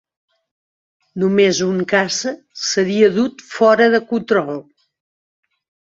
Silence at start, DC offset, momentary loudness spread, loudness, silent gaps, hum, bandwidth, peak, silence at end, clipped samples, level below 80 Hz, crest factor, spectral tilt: 1.15 s; under 0.1%; 11 LU; -16 LUFS; none; none; 7.8 kHz; -2 dBFS; 1.35 s; under 0.1%; -62 dBFS; 16 dB; -4 dB/octave